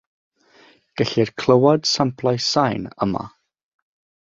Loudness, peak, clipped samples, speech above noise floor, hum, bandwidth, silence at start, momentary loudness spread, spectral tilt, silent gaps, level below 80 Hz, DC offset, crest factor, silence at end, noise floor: -19 LUFS; -2 dBFS; under 0.1%; 34 dB; none; 7.8 kHz; 0.95 s; 11 LU; -5 dB/octave; none; -56 dBFS; under 0.1%; 20 dB; 0.95 s; -53 dBFS